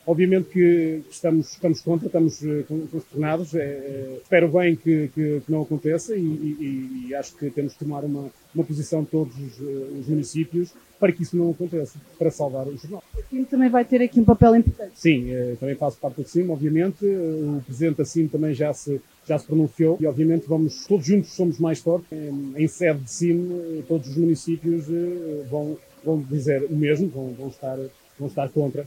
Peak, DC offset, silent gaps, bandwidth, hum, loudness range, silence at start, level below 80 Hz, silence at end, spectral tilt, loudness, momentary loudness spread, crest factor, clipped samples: 0 dBFS; under 0.1%; none; 16 kHz; none; 7 LU; 0.05 s; -46 dBFS; 0 s; -7.5 dB/octave; -23 LUFS; 12 LU; 22 dB; under 0.1%